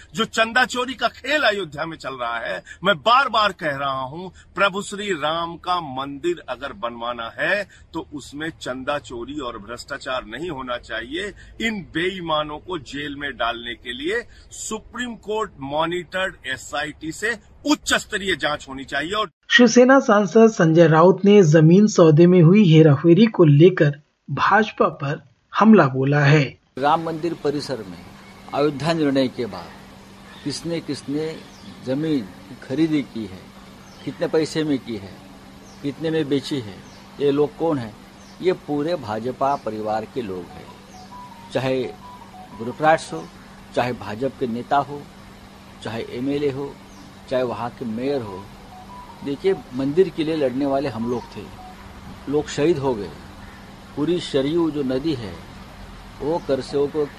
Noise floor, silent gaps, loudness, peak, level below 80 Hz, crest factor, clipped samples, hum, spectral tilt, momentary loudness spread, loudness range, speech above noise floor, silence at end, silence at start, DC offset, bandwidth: -43 dBFS; 19.33-19.41 s; -20 LUFS; -2 dBFS; -50 dBFS; 18 dB; under 0.1%; none; -6 dB/octave; 22 LU; 13 LU; 23 dB; 0 s; 0 s; under 0.1%; 13 kHz